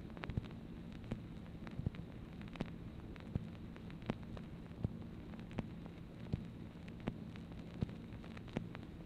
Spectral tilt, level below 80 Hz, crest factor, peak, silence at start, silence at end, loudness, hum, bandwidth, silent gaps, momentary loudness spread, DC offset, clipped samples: -8 dB/octave; -56 dBFS; 26 dB; -20 dBFS; 0 s; 0 s; -48 LUFS; none; 15 kHz; none; 6 LU; under 0.1%; under 0.1%